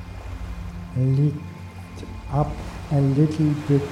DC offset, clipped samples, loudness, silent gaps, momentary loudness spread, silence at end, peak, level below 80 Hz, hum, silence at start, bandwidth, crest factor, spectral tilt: under 0.1%; under 0.1%; -23 LUFS; none; 17 LU; 0 s; -6 dBFS; -38 dBFS; none; 0 s; 10 kHz; 16 dB; -9 dB/octave